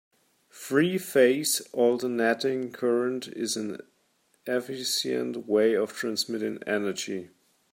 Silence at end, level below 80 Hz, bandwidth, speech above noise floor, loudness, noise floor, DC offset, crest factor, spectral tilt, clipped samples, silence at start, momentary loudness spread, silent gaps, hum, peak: 0.45 s; -78 dBFS; 16.5 kHz; 42 dB; -27 LUFS; -69 dBFS; under 0.1%; 20 dB; -3.5 dB/octave; under 0.1%; 0.55 s; 10 LU; none; none; -8 dBFS